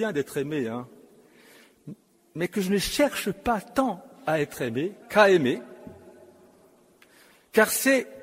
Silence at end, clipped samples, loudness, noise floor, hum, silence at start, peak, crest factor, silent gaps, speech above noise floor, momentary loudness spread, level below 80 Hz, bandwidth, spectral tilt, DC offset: 0 s; under 0.1%; -25 LUFS; -58 dBFS; none; 0 s; -4 dBFS; 22 dB; none; 33 dB; 23 LU; -54 dBFS; 16 kHz; -4 dB/octave; under 0.1%